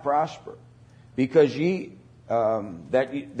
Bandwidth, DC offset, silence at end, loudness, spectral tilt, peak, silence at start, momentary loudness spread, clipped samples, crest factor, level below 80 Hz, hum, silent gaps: 8.8 kHz; under 0.1%; 0 s; -25 LUFS; -7.5 dB/octave; -8 dBFS; 0 s; 18 LU; under 0.1%; 18 dB; -64 dBFS; none; none